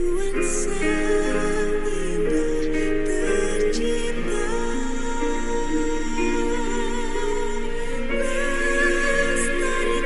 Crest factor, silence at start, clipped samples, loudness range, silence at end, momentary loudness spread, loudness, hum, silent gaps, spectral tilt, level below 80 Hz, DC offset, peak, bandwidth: 14 dB; 0 s; under 0.1%; 2 LU; 0 s; 6 LU; -24 LUFS; none; none; -4 dB/octave; -26 dBFS; under 0.1%; -8 dBFS; 11.5 kHz